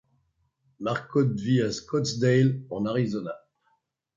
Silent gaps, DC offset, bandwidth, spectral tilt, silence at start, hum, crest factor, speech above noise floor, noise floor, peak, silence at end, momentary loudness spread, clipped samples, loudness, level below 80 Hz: none; under 0.1%; 7.6 kHz; -6.5 dB/octave; 0.8 s; none; 16 dB; 47 dB; -72 dBFS; -10 dBFS; 0.8 s; 12 LU; under 0.1%; -26 LUFS; -64 dBFS